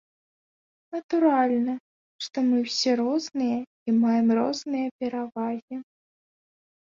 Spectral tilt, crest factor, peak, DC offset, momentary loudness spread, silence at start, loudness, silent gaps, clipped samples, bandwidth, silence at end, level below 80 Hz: -4.5 dB/octave; 16 dB; -10 dBFS; under 0.1%; 15 LU; 0.9 s; -25 LUFS; 1.03-1.09 s, 1.80-2.19 s, 3.67-3.86 s, 4.91-4.99 s, 5.62-5.68 s; under 0.1%; 7.6 kHz; 1 s; -74 dBFS